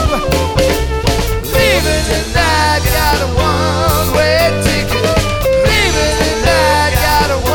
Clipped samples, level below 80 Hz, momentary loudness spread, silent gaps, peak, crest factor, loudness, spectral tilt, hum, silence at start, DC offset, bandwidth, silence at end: under 0.1%; -20 dBFS; 4 LU; none; 0 dBFS; 12 dB; -12 LUFS; -4 dB/octave; none; 0 s; under 0.1%; over 20 kHz; 0 s